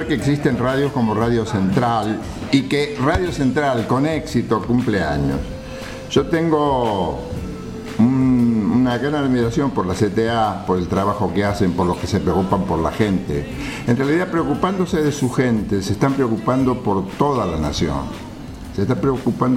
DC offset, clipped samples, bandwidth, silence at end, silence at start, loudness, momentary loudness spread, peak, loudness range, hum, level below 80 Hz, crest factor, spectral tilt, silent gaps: under 0.1%; under 0.1%; 15.5 kHz; 0 s; 0 s; -19 LUFS; 8 LU; -2 dBFS; 2 LU; none; -36 dBFS; 16 dB; -6.5 dB/octave; none